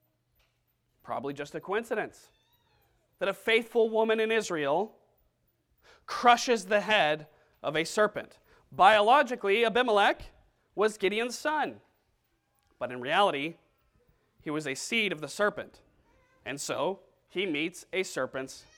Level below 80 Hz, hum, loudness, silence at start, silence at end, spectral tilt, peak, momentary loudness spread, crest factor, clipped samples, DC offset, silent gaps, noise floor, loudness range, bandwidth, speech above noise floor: -66 dBFS; none; -28 LUFS; 1.05 s; 0.2 s; -3 dB/octave; -8 dBFS; 15 LU; 22 dB; under 0.1%; under 0.1%; none; -75 dBFS; 8 LU; 17 kHz; 47 dB